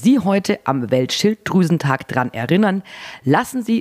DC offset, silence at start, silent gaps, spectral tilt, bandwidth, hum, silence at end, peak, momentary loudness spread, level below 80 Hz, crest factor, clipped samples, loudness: under 0.1%; 0 s; none; -6 dB/octave; 15.5 kHz; none; 0 s; -2 dBFS; 5 LU; -56 dBFS; 16 dB; under 0.1%; -18 LUFS